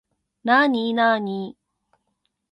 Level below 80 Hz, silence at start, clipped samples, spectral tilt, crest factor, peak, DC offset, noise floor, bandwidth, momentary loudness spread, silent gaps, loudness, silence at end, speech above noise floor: -74 dBFS; 0.45 s; under 0.1%; -6.5 dB/octave; 20 dB; -4 dBFS; under 0.1%; -74 dBFS; 6 kHz; 14 LU; none; -20 LUFS; 1 s; 54 dB